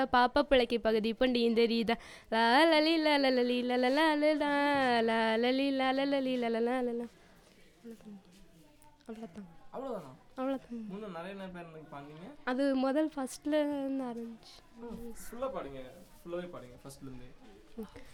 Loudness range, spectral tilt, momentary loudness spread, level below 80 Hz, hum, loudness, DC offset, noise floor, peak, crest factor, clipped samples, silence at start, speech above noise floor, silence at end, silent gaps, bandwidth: 16 LU; -4.5 dB/octave; 22 LU; -60 dBFS; none; -30 LUFS; under 0.1%; -60 dBFS; -14 dBFS; 18 dB; under 0.1%; 0 s; 28 dB; 0 s; none; 17 kHz